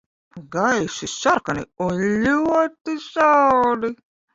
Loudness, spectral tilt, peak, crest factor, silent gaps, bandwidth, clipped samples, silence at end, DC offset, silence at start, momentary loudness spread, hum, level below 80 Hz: -20 LUFS; -4.5 dB/octave; -4 dBFS; 16 dB; 2.81-2.85 s; 7.8 kHz; under 0.1%; 0.4 s; under 0.1%; 0.35 s; 12 LU; none; -54 dBFS